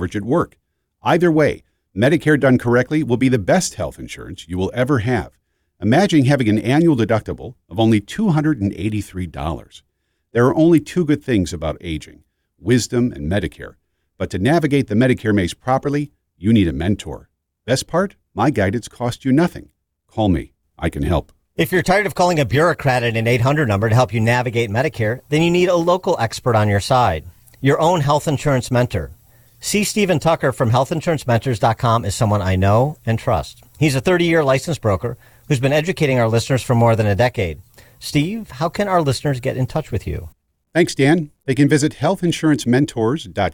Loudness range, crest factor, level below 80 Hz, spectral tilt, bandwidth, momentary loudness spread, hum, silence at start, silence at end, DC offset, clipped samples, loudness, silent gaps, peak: 4 LU; 16 dB; -42 dBFS; -6 dB/octave; 19 kHz; 12 LU; none; 0 s; 0 s; under 0.1%; under 0.1%; -18 LUFS; none; -2 dBFS